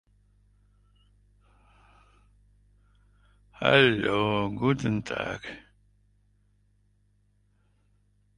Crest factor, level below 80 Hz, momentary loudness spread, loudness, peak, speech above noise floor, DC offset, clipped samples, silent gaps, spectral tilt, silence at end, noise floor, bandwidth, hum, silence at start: 28 dB; -58 dBFS; 18 LU; -25 LUFS; -4 dBFS; 42 dB; under 0.1%; under 0.1%; none; -6 dB/octave; 2.8 s; -67 dBFS; 11 kHz; 50 Hz at -55 dBFS; 3.6 s